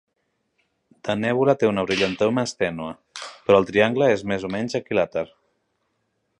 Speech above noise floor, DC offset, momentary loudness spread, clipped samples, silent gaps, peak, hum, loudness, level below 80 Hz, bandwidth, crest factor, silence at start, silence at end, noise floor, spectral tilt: 52 dB; under 0.1%; 15 LU; under 0.1%; none; -4 dBFS; none; -22 LUFS; -56 dBFS; 10.5 kHz; 20 dB; 1.05 s; 1.15 s; -73 dBFS; -5.5 dB/octave